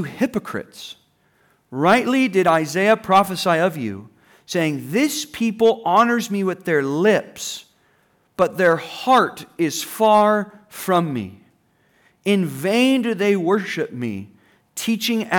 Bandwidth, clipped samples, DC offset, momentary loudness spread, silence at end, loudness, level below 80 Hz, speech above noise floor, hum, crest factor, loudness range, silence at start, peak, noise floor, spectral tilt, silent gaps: over 20 kHz; under 0.1%; under 0.1%; 14 LU; 0 s; -19 LUFS; -64 dBFS; 42 dB; none; 14 dB; 3 LU; 0 s; -6 dBFS; -61 dBFS; -5 dB/octave; none